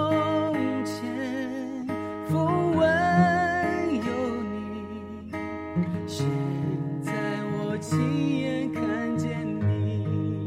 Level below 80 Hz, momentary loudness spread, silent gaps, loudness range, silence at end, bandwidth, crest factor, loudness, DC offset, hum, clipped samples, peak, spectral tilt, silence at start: -56 dBFS; 11 LU; none; 5 LU; 0 s; 15 kHz; 16 dB; -27 LUFS; under 0.1%; none; under 0.1%; -10 dBFS; -7 dB/octave; 0 s